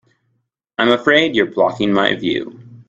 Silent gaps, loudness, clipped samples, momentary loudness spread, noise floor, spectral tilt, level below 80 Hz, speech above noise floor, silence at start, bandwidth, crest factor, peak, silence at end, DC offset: none; -16 LUFS; under 0.1%; 11 LU; -69 dBFS; -5.5 dB/octave; -56 dBFS; 53 dB; 0.8 s; 7.8 kHz; 18 dB; 0 dBFS; 0.05 s; under 0.1%